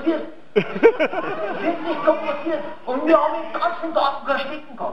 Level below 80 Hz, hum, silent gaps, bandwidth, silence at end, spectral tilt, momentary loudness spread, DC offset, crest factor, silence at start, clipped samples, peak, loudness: -62 dBFS; none; none; 6.8 kHz; 0 s; -6.5 dB/octave; 10 LU; 2%; 20 dB; 0 s; under 0.1%; -2 dBFS; -21 LUFS